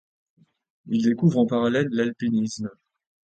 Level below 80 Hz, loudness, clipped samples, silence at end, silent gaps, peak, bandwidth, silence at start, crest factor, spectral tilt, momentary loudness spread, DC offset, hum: -66 dBFS; -23 LUFS; under 0.1%; 0.55 s; none; -8 dBFS; 9 kHz; 0.85 s; 16 dB; -7 dB/octave; 9 LU; under 0.1%; none